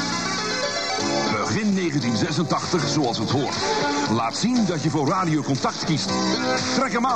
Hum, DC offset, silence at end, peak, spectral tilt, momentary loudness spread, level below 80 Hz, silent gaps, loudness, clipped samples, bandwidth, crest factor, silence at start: none; 0.3%; 0 s; -10 dBFS; -4.5 dB/octave; 2 LU; -56 dBFS; none; -22 LUFS; under 0.1%; 10.5 kHz; 12 dB; 0 s